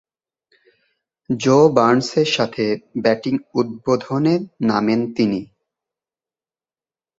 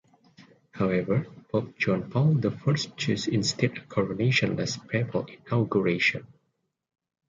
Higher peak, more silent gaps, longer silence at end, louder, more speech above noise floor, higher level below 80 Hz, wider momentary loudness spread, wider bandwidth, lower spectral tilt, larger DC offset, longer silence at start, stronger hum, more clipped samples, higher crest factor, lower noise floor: first, -2 dBFS vs -10 dBFS; neither; first, 1.75 s vs 1.05 s; first, -18 LUFS vs -27 LUFS; first, over 72 dB vs 50 dB; about the same, -60 dBFS vs -60 dBFS; about the same, 9 LU vs 7 LU; second, 8 kHz vs 9 kHz; about the same, -6 dB/octave vs -5.5 dB/octave; neither; first, 1.3 s vs 0.4 s; neither; neither; about the same, 18 dB vs 18 dB; first, under -90 dBFS vs -76 dBFS